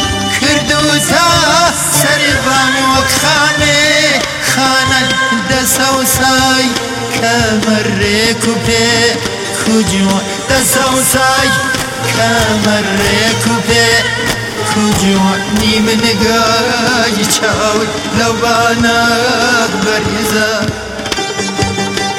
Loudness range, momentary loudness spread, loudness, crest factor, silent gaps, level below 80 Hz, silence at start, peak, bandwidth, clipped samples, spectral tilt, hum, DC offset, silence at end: 2 LU; 6 LU; -10 LUFS; 12 dB; none; -34 dBFS; 0 s; 0 dBFS; 16.5 kHz; under 0.1%; -3 dB/octave; none; under 0.1%; 0 s